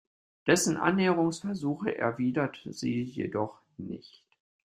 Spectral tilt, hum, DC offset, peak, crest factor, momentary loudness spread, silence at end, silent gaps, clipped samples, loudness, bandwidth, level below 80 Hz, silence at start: -5 dB/octave; none; under 0.1%; -8 dBFS; 22 dB; 16 LU; 0.7 s; none; under 0.1%; -29 LUFS; 15.5 kHz; -68 dBFS; 0.45 s